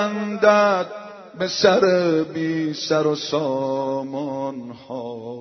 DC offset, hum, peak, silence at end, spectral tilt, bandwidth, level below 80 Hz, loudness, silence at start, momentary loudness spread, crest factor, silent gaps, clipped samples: under 0.1%; none; 0 dBFS; 0 s; -3.5 dB/octave; 6.4 kHz; -68 dBFS; -20 LUFS; 0 s; 16 LU; 20 dB; none; under 0.1%